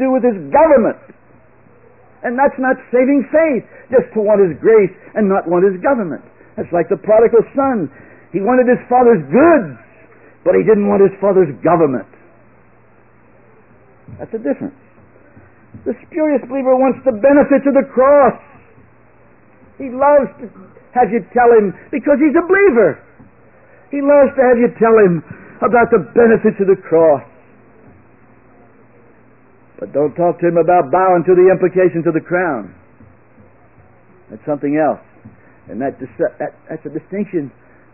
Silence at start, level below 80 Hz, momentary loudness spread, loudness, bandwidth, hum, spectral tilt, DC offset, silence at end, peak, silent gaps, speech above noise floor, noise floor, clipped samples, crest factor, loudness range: 0 s; -50 dBFS; 16 LU; -13 LUFS; 3 kHz; none; -13 dB/octave; 0.3%; 0.45 s; 0 dBFS; none; 36 dB; -49 dBFS; under 0.1%; 14 dB; 9 LU